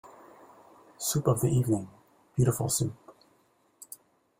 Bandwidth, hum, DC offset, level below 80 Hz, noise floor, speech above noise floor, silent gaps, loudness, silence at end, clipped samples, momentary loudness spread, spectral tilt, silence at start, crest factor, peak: 16.5 kHz; none; under 0.1%; -58 dBFS; -67 dBFS; 40 dB; none; -28 LUFS; 0.55 s; under 0.1%; 21 LU; -5.5 dB/octave; 0.05 s; 20 dB; -10 dBFS